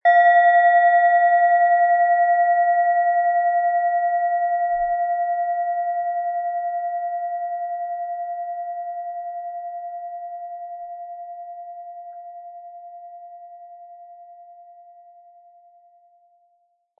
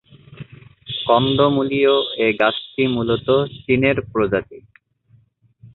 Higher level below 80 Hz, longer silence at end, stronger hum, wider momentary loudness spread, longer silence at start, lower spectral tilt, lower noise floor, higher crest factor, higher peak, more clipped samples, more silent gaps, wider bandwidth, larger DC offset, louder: second, -64 dBFS vs -50 dBFS; first, 2.4 s vs 0.1 s; neither; first, 23 LU vs 8 LU; second, 0.05 s vs 0.3 s; second, -3.5 dB/octave vs -9.5 dB/octave; first, -66 dBFS vs -56 dBFS; about the same, 16 dB vs 18 dB; second, -6 dBFS vs -2 dBFS; neither; neither; second, 3.8 kHz vs 4.3 kHz; neither; about the same, -20 LUFS vs -18 LUFS